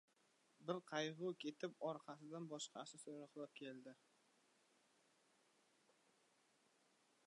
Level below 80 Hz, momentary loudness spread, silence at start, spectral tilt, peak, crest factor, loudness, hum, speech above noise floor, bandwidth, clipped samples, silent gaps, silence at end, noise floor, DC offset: under -90 dBFS; 10 LU; 0.6 s; -4 dB/octave; -30 dBFS; 24 dB; -51 LUFS; none; 29 dB; 11 kHz; under 0.1%; none; 3.35 s; -79 dBFS; under 0.1%